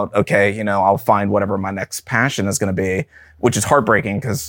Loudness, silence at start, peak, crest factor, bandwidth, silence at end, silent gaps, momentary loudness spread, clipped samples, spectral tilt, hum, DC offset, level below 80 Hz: -17 LUFS; 0 s; 0 dBFS; 16 dB; 17 kHz; 0 s; none; 8 LU; under 0.1%; -5 dB/octave; none; under 0.1%; -48 dBFS